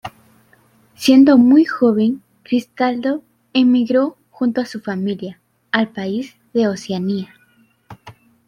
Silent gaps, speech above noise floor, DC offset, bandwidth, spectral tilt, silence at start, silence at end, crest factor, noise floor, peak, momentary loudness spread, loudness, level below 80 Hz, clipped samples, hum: none; 41 dB; under 0.1%; 14 kHz; -6 dB/octave; 0.05 s; 0.35 s; 16 dB; -56 dBFS; 0 dBFS; 15 LU; -17 LUFS; -62 dBFS; under 0.1%; none